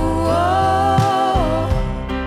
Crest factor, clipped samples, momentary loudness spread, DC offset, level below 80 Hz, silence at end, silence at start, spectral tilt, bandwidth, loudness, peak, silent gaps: 10 dB; under 0.1%; 6 LU; under 0.1%; -26 dBFS; 0 s; 0 s; -6.5 dB/octave; 15 kHz; -17 LUFS; -6 dBFS; none